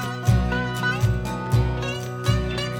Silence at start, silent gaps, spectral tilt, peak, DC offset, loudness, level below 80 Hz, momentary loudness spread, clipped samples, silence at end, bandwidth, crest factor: 0 s; none; -6 dB/octave; -6 dBFS; under 0.1%; -23 LUFS; -32 dBFS; 5 LU; under 0.1%; 0 s; 17 kHz; 16 dB